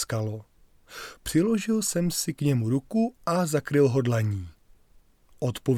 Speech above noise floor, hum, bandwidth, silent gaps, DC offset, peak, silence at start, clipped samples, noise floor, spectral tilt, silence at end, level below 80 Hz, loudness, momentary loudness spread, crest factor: 32 dB; none; 18 kHz; none; under 0.1%; -10 dBFS; 0 s; under 0.1%; -58 dBFS; -5.5 dB/octave; 0 s; -54 dBFS; -26 LUFS; 16 LU; 16 dB